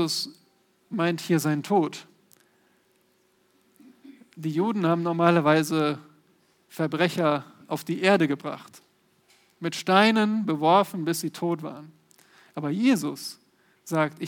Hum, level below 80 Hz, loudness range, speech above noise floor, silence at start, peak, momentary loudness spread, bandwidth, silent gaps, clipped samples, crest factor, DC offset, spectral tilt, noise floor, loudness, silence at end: none; -82 dBFS; 6 LU; 42 dB; 0 s; -4 dBFS; 15 LU; 19 kHz; none; under 0.1%; 22 dB; under 0.1%; -5.5 dB/octave; -66 dBFS; -25 LUFS; 0 s